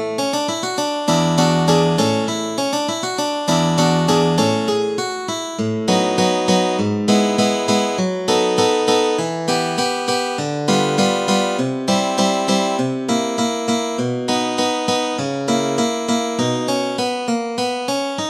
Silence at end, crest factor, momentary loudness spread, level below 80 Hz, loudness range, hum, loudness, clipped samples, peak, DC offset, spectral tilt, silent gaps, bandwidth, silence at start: 0 s; 16 dB; 6 LU; -58 dBFS; 2 LU; none; -18 LUFS; under 0.1%; -2 dBFS; under 0.1%; -4.5 dB/octave; none; 14.5 kHz; 0 s